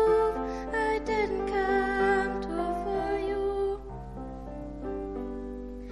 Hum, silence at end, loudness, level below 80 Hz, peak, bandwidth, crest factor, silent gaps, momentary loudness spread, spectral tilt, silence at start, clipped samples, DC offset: 50 Hz at -45 dBFS; 0 s; -30 LUFS; -44 dBFS; -14 dBFS; 11 kHz; 16 dB; none; 15 LU; -6.5 dB/octave; 0 s; under 0.1%; under 0.1%